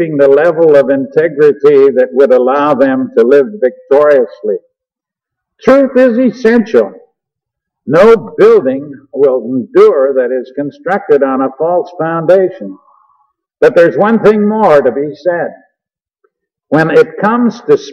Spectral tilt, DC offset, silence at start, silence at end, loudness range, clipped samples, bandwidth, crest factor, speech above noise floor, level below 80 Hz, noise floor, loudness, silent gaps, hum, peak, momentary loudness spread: -7.5 dB/octave; under 0.1%; 0 s; 0 s; 4 LU; 0.3%; 7.2 kHz; 10 dB; 74 dB; -52 dBFS; -83 dBFS; -9 LUFS; none; none; 0 dBFS; 10 LU